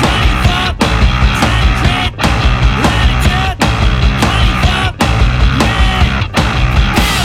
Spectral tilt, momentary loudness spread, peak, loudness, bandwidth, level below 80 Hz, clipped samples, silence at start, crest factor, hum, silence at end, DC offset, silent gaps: -5 dB/octave; 2 LU; 0 dBFS; -12 LUFS; 15.5 kHz; -14 dBFS; under 0.1%; 0 s; 10 dB; none; 0 s; under 0.1%; none